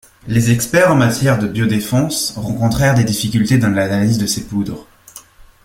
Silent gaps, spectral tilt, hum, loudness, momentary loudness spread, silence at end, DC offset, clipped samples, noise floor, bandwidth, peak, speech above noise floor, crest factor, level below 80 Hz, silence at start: none; -5.5 dB/octave; none; -15 LUFS; 7 LU; 0.45 s; under 0.1%; under 0.1%; -41 dBFS; 16.5 kHz; 0 dBFS; 26 dB; 16 dB; -40 dBFS; 0.25 s